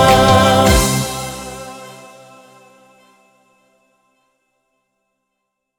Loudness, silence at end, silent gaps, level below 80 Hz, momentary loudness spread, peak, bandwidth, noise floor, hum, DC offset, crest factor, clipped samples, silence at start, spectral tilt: -13 LUFS; 3.85 s; none; -30 dBFS; 25 LU; 0 dBFS; over 20 kHz; -75 dBFS; none; under 0.1%; 18 dB; under 0.1%; 0 s; -4 dB/octave